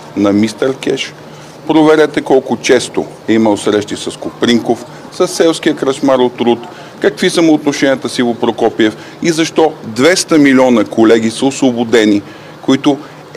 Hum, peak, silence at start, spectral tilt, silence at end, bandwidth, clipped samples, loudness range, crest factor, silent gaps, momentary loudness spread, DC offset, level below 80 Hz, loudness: none; 0 dBFS; 0 s; -4.5 dB/octave; 0 s; 15 kHz; 0.2%; 3 LU; 12 dB; none; 11 LU; under 0.1%; -54 dBFS; -12 LUFS